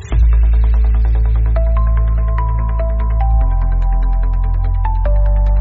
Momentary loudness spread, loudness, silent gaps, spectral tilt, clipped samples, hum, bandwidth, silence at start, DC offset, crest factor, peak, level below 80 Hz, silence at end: 4 LU; -16 LUFS; none; -8.5 dB/octave; under 0.1%; none; 2.9 kHz; 0 s; under 0.1%; 8 dB; -4 dBFS; -12 dBFS; 0 s